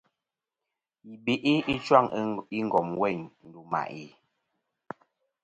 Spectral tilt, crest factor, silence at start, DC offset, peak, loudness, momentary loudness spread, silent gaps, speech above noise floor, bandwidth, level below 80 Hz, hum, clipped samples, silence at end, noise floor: -6.5 dB/octave; 26 dB; 1.05 s; under 0.1%; -4 dBFS; -27 LUFS; 23 LU; none; 61 dB; 9 kHz; -64 dBFS; none; under 0.1%; 1.35 s; -88 dBFS